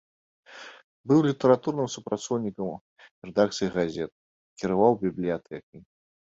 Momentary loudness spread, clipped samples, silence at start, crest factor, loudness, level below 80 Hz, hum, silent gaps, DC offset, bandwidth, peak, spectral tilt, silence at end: 22 LU; under 0.1%; 0.5 s; 20 dB; -26 LUFS; -62 dBFS; none; 0.84-1.04 s, 2.81-2.96 s, 3.11-3.22 s, 4.12-4.56 s, 5.63-5.73 s; under 0.1%; 8 kHz; -6 dBFS; -6 dB/octave; 0.5 s